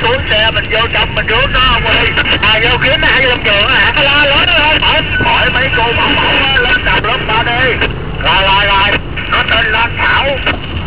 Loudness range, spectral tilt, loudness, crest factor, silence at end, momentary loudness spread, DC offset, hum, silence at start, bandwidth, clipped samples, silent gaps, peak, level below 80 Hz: 2 LU; -7.5 dB/octave; -9 LUFS; 10 dB; 0 s; 4 LU; 4%; none; 0 s; 4 kHz; under 0.1%; none; 0 dBFS; -22 dBFS